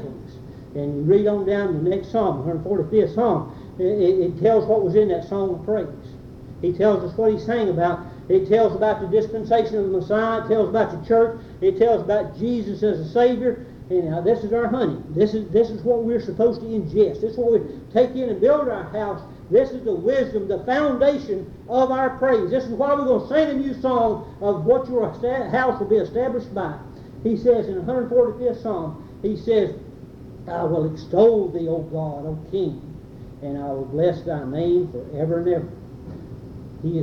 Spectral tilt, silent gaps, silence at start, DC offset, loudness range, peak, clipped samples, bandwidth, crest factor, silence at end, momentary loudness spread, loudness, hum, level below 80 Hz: -8.5 dB/octave; none; 0 s; under 0.1%; 3 LU; -4 dBFS; under 0.1%; 6.8 kHz; 16 dB; 0 s; 13 LU; -21 LUFS; none; -48 dBFS